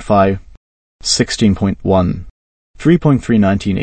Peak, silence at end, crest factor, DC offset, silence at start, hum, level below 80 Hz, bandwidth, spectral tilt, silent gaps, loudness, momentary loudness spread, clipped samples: 0 dBFS; 0 s; 14 dB; 0.1%; 0 s; none; -36 dBFS; 8.8 kHz; -5.5 dB/octave; 0.57-0.99 s, 2.30-2.74 s; -14 LUFS; 8 LU; under 0.1%